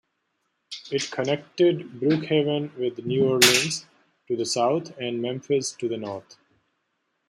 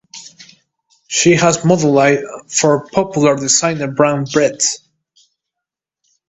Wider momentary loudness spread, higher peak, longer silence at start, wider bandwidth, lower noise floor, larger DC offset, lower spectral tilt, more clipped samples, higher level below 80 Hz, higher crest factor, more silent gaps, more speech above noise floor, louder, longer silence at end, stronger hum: first, 15 LU vs 8 LU; about the same, -2 dBFS vs 0 dBFS; first, 0.7 s vs 0.15 s; first, 16.5 kHz vs 8.4 kHz; second, -75 dBFS vs -83 dBFS; neither; about the same, -3.5 dB/octave vs -4 dB/octave; neither; second, -70 dBFS vs -54 dBFS; first, 24 dB vs 16 dB; neither; second, 51 dB vs 69 dB; second, -24 LUFS vs -14 LUFS; second, 1.1 s vs 1.55 s; neither